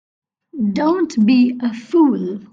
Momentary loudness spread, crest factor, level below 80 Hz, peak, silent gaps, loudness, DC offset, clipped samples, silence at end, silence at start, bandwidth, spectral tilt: 9 LU; 14 dB; -64 dBFS; -4 dBFS; none; -16 LUFS; under 0.1%; under 0.1%; 0.1 s; 0.55 s; 7.6 kHz; -7 dB/octave